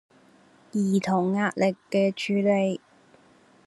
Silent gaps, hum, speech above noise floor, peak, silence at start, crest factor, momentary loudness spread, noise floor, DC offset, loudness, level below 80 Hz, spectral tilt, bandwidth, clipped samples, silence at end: none; none; 33 dB; -10 dBFS; 0.75 s; 16 dB; 6 LU; -57 dBFS; under 0.1%; -25 LUFS; -70 dBFS; -6.5 dB/octave; 12 kHz; under 0.1%; 0.9 s